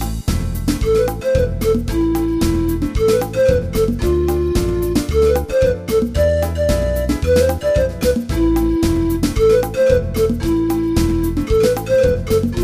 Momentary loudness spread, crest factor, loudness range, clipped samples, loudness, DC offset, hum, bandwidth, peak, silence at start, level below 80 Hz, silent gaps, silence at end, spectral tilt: 4 LU; 14 dB; 1 LU; under 0.1%; -17 LUFS; under 0.1%; none; 15.5 kHz; 0 dBFS; 0 s; -24 dBFS; none; 0 s; -6.5 dB/octave